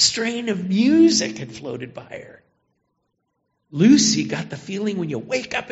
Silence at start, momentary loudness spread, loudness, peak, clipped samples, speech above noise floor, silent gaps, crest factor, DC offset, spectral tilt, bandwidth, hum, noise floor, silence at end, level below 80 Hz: 0 s; 19 LU; -19 LUFS; -2 dBFS; under 0.1%; 53 dB; none; 18 dB; under 0.1%; -4 dB/octave; 8 kHz; none; -73 dBFS; 0 s; -58 dBFS